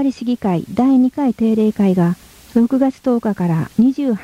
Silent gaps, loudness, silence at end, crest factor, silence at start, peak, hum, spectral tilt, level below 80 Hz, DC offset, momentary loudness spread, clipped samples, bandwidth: none; -16 LUFS; 0 s; 12 dB; 0 s; -4 dBFS; none; -8.5 dB/octave; -52 dBFS; under 0.1%; 5 LU; under 0.1%; 14.5 kHz